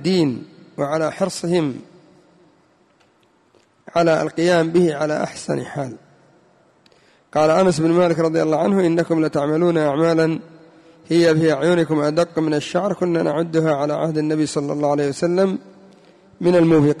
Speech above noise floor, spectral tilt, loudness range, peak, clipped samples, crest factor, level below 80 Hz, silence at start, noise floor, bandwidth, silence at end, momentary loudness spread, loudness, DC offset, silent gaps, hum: 40 dB; -6.5 dB/octave; 6 LU; -6 dBFS; under 0.1%; 14 dB; -58 dBFS; 0 s; -58 dBFS; 11.5 kHz; 0 s; 9 LU; -19 LUFS; under 0.1%; none; none